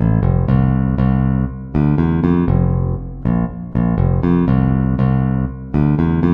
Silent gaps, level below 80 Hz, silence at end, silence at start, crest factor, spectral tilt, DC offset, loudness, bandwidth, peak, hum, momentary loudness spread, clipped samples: none; -26 dBFS; 0 s; 0 s; 14 dB; -12 dB/octave; under 0.1%; -16 LUFS; 3.9 kHz; -2 dBFS; none; 5 LU; under 0.1%